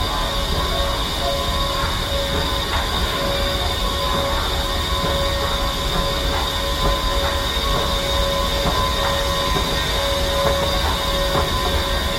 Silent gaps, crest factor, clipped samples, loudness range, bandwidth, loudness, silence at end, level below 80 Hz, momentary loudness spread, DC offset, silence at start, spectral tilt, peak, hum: none; 16 dB; under 0.1%; 1 LU; 16.5 kHz; -20 LUFS; 0 s; -26 dBFS; 2 LU; under 0.1%; 0 s; -3.5 dB/octave; -4 dBFS; none